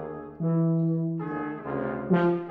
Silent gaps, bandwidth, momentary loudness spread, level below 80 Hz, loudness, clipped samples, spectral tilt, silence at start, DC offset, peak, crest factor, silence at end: none; 4 kHz; 8 LU; -60 dBFS; -27 LUFS; under 0.1%; -11.5 dB/octave; 0 s; under 0.1%; -10 dBFS; 16 dB; 0 s